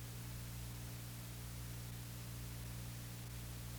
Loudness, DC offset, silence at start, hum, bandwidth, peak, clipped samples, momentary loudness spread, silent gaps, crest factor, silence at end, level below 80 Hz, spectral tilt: -49 LUFS; under 0.1%; 0 s; 60 Hz at -60 dBFS; over 20 kHz; -36 dBFS; under 0.1%; 1 LU; none; 12 dB; 0 s; -56 dBFS; -4.5 dB/octave